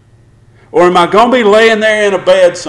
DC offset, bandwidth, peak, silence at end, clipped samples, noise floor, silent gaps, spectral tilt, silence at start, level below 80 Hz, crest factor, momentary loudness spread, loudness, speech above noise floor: under 0.1%; 12 kHz; 0 dBFS; 0 s; under 0.1%; -43 dBFS; none; -4.5 dB/octave; 0.75 s; -46 dBFS; 8 dB; 4 LU; -8 LUFS; 36 dB